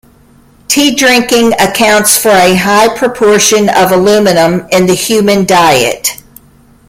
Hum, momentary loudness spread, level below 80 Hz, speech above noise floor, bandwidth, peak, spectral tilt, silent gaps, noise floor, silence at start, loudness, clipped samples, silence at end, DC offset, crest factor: none; 4 LU; -42 dBFS; 35 dB; over 20 kHz; 0 dBFS; -3 dB/octave; none; -42 dBFS; 0.7 s; -7 LUFS; 0.2%; 0.75 s; under 0.1%; 8 dB